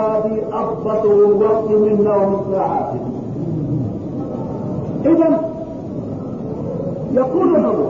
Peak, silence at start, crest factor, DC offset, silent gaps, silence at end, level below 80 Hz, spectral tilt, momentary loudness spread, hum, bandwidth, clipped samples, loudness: -4 dBFS; 0 s; 14 dB; 0.2%; none; 0 s; -46 dBFS; -10.5 dB/octave; 12 LU; none; 7 kHz; under 0.1%; -18 LUFS